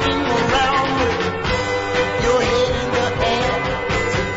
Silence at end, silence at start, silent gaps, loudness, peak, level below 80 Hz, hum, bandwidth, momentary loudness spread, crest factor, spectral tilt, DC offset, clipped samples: 0 s; 0 s; none; -18 LUFS; -6 dBFS; -34 dBFS; none; 8 kHz; 4 LU; 14 dB; -4.5 dB/octave; under 0.1%; under 0.1%